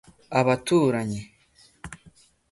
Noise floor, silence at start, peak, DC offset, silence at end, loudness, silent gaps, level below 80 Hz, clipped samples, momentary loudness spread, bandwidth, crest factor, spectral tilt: -59 dBFS; 0.3 s; -6 dBFS; under 0.1%; 0.45 s; -23 LUFS; none; -56 dBFS; under 0.1%; 22 LU; 11.5 kHz; 20 dB; -6 dB/octave